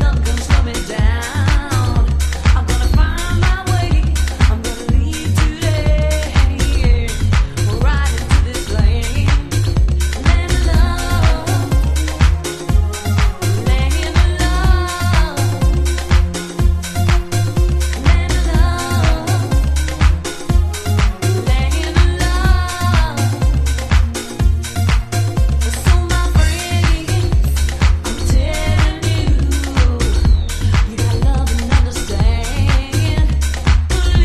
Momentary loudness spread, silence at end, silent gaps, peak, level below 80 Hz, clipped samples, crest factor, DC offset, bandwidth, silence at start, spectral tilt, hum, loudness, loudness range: 3 LU; 0 s; none; 0 dBFS; -16 dBFS; under 0.1%; 14 dB; under 0.1%; 14 kHz; 0 s; -5 dB/octave; none; -16 LUFS; 1 LU